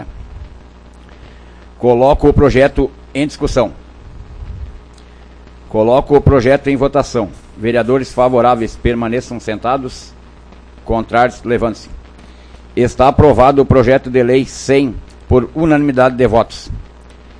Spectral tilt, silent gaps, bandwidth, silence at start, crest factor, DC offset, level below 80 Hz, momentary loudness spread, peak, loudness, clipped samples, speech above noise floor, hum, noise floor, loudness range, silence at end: -7 dB/octave; none; 10.5 kHz; 0 s; 14 dB; under 0.1%; -28 dBFS; 20 LU; 0 dBFS; -13 LUFS; 0.2%; 26 dB; 60 Hz at -40 dBFS; -38 dBFS; 7 LU; 0.6 s